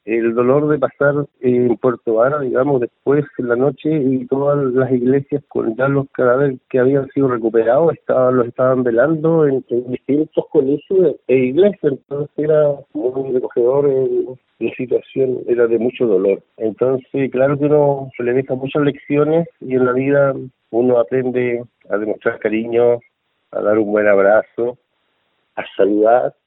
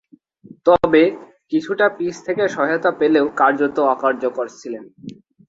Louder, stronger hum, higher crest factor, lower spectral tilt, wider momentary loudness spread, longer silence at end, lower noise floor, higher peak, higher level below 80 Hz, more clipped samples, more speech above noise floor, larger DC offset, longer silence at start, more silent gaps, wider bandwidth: about the same, -16 LUFS vs -18 LUFS; neither; about the same, 16 dB vs 18 dB; first, -12.5 dB/octave vs -5.5 dB/octave; second, 7 LU vs 17 LU; second, 0.15 s vs 0.35 s; first, -66 dBFS vs -46 dBFS; about the same, 0 dBFS vs -2 dBFS; second, -60 dBFS vs -54 dBFS; neither; first, 50 dB vs 28 dB; neither; second, 0.05 s vs 0.65 s; neither; second, 4 kHz vs 7.8 kHz